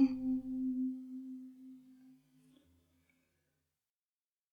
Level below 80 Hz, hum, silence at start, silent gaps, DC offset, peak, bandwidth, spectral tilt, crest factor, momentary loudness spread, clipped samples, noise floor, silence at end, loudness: -72 dBFS; none; 0 s; none; under 0.1%; -20 dBFS; 5 kHz; -7.5 dB/octave; 22 dB; 20 LU; under 0.1%; under -90 dBFS; 2.4 s; -39 LUFS